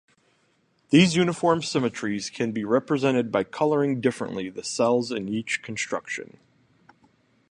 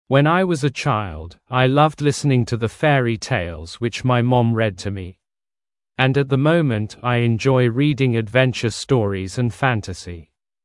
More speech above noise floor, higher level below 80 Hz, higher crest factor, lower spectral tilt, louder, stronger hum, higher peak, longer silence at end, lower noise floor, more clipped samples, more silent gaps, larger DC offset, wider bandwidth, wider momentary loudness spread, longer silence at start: second, 43 dB vs over 72 dB; second, -64 dBFS vs -50 dBFS; about the same, 20 dB vs 18 dB; second, -5 dB/octave vs -6.5 dB/octave; second, -24 LUFS vs -19 LUFS; neither; second, -4 dBFS vs 0 dBFS; first, 1.25 s vs 0.4 s; second, -67 dBFS vs under -90 dBFS; neither; neither; neither; about the same, 11 kHz vs 11.5 kHz; about the same, 11 LU vs 13 LU; first, 0.9 s vs 0.1 s